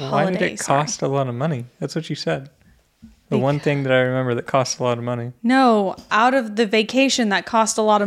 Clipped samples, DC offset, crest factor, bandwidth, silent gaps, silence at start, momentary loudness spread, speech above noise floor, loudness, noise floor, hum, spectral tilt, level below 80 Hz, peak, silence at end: under 0.1%; under 0.1%; 18 dB; 14 kHz; none; 0 s; 8 LU; 31 dB; -20 LUFS; -50 dBFS; none; -4.5 dB/octave; -60 dBFS; -2 dBFS; 0 s